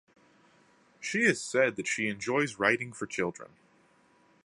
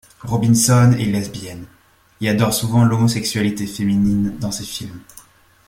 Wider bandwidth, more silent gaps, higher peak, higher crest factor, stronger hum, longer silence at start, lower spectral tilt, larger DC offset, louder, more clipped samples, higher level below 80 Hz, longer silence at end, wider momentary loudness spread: second, 11.5 kHz vs 16.5 kHz; neither; second, -8 dBFS vs -2 dBFS; first, 24 dB vs 16 dB; neither; first, 1 s vs 0.25 s; second, -4 dB/octave vs -5.5 dB/octave; neither; second, -29 LUFS vs -17 LUFS; neither; second, -72 dBFS vs -44 dBFS; first, 1 s vs 0.65 s; second, 9 LU vs 17 LU